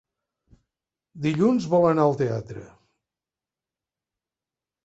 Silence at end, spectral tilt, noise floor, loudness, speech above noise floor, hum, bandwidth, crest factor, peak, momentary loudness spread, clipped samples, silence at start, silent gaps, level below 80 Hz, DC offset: 2.2 s; -8 dB/octave; under -90 dBFS; -22 LUFS; over 68 dB; none; 8.2 kHz; 20 dB; -6 dBFS; 16 LU; under 0.1%; 1.15 s; none; -62 dBFS; under 0.1%